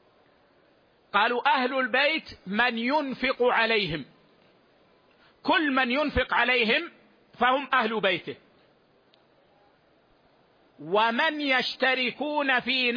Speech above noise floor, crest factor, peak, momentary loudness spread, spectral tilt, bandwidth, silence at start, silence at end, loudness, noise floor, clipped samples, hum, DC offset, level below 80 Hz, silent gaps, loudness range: 38 dB; 18 dB; -8 dBFS; 8 LU; -5.5 dB/octave; 5.2 kHz; 1.15 s; 0 s; -24 LUFS; -63 dBFS; under 0.1%; none; under 0.1%; -52 dBFS; none; 6 LU